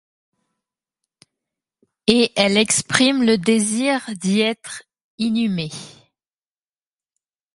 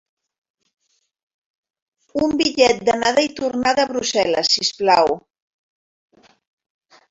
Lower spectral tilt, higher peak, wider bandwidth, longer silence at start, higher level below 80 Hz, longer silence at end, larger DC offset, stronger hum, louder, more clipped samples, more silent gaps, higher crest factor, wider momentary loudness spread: about the same, -3.5 dB/octave vs -2.5 dB/octave; about the same, 0 dBFS vs -2 dBFS; first, 11.5 kHz vs 8 kHz; about the same, 2.05 s vs 2.15 s; about the same, -60 dBFS vs -56 dBFS; second, 1.65 s vs 1.9 s; neither; neither; about the same, -18 LUFS vs -18 LUFS; neither; first, 5.04-5.18 s vs none; about the same, 22 dB vs 20 dB; first, 15 LU vs 6 LU